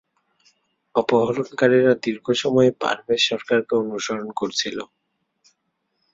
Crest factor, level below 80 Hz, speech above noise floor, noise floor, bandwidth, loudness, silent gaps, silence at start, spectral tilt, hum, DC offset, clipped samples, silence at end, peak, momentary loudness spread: 18 dB; -64 dBFS; 53 dB; -74 dBFS; 7.8 kHz; -21 LUFS; none; 0.95 s; -4.5 dB/octave; none; under 0.1%; under 0.1%; 1.3 s; -4 dBFS; 9 LU